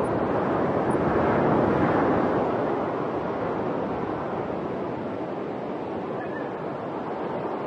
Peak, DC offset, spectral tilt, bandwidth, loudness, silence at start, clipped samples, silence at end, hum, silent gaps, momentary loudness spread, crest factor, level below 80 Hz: -10 dBFS; under 0.1%; -8.5 dB/octave; 10.5 kHz; -26 LUFS; 0 s; under 0.1%; 0 s; none; none; 9 LU; 16 dB; -52 dBFS